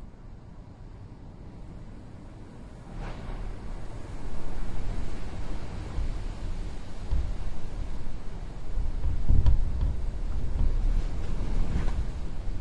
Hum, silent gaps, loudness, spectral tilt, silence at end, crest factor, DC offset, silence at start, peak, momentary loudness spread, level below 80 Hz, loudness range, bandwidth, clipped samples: none; none; -35 LUFS; -7 dB/octave; 0 s; 20 dB; under 0.1%; 0 s; -6 dBFS; 16 LU; -30 dBFS; 12 LU; 8.2 kHz; under 0.1%